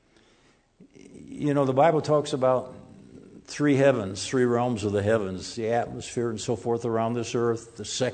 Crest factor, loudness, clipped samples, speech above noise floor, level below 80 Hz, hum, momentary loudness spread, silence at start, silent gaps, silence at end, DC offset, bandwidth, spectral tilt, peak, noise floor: 18 dB; -25 LUFS; under 0.1%; 36 dB; -62 dBFS; none; 11 LU; 1.15 s; none; 0 s; under 0.1%; 9.4 kHz; -5.5 dB/octave; -8 dBFS; -62 dBFS